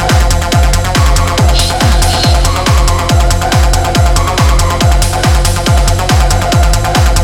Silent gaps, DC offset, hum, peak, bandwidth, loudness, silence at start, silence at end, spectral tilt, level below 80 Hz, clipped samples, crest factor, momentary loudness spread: none; under 0.1%; none; 0 dBFS; 17.5 kHz; -10 LUFS; 0 s; 0 s; -4.5 dB/octave; -12 dBFS; under 0.1%; 8 dB; 1 LU